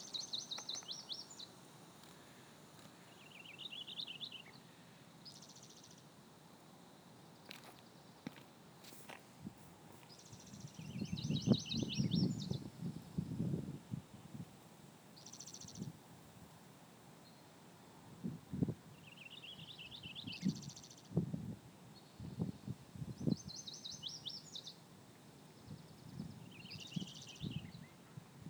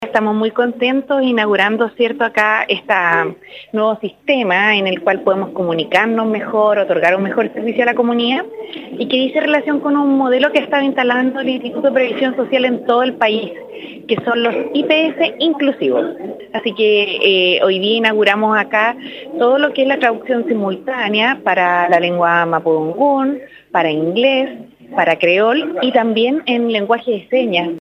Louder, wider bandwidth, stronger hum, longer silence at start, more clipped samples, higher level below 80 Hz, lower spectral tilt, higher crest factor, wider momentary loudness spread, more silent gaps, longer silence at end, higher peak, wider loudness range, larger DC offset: second, -45 LUFS vs -15 LUFS; first, over 20 kHz vs 8.8 kHz; neither; about the same, 0 s vs 0 s; neither; second, -72 dBFS vs -66 dBFS; about the same, -5 dB/octave vs -6 dB/octave; first, 28 dB vs 14 dB; first, 19 LU vs 7 LU; neither; about the same, 0 s vs 0 s; second, -20 dBFS vs 0 dBFS; first, 15 LU vs 2 LU; neither